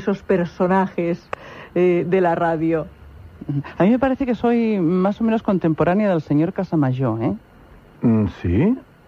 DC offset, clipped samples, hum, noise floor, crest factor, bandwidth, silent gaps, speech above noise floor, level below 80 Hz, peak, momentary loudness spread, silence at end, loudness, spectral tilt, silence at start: under 0.1%; under 0.1%; none; -46 dBFS; 14 dB; 7 kHz; none; 27 dB; -46 dBFS; -4 dBFS; 9 LU; 0.25 s; -20 LUFS; -9.5 dB/octave; 0 s